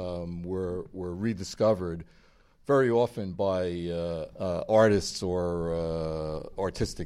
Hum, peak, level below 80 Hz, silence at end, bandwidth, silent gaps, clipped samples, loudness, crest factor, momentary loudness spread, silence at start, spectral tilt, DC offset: none; -8 dBFS; -48 dBFS; 0 s; 13.5 kHz; none; under 0.1%; -29 LUFS; 20 dB; 12 LU; 0 s; -6 dB/octave; under 0.1%